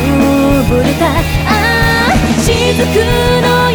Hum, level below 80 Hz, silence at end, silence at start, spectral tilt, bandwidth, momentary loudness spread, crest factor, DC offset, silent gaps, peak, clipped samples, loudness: none; -20 dBFS; 0 s; 0 s; -5 dB/octave; over 20 kHz; 2 LU; 10 dB; 0.6%; none; 0 dBFS; under 0.1%; -10 LUFS